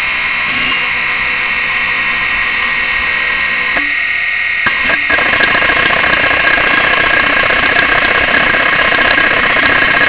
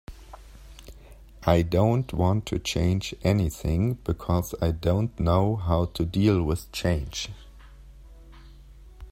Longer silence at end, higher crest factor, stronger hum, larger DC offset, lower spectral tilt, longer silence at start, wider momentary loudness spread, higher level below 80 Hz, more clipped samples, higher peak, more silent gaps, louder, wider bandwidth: about the same, 0 s vs 0 s; second, 12 dB vs 20 dB; neither; first, 0.7% vs under 0.1%; about the same, -6 dB/octave vs -6.5 dB/octave; about the same, 0 s vs 0.1 s; second, 3 LU vs 7 LU; about the same, -36 dBFS vs -40 dBFS; neither; first, 0 dBFS vs -6 dBFS; neither; first, -10 LUFS vs -26 LUFS; second, 4 kHz vs 16 kHz